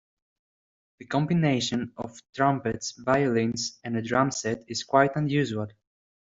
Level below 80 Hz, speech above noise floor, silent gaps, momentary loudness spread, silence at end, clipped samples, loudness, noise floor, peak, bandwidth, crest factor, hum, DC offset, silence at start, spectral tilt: -62 dBFS; over 64 dB; 2.29-2.33 s; 10 LU; 0.5 s; under 0.1%; -26 LUFS; under -90 dBFS; -4 dBFS; 7.8 kHz; 22 dB; none; under 0.1%; 1 s; -5 dB/octave